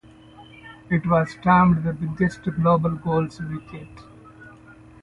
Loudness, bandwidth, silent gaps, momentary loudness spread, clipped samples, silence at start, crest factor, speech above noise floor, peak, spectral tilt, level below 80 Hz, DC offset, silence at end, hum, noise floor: -21 LUFS; 7.4 kHz; none; 23 LU; under 0.1%; 0.4 s; 18 dB; 26 dB; -4 dBFS; -8.5 dB/octave; -48 dBFS; under 0.1%; 0.55 s; none; -47 dBFS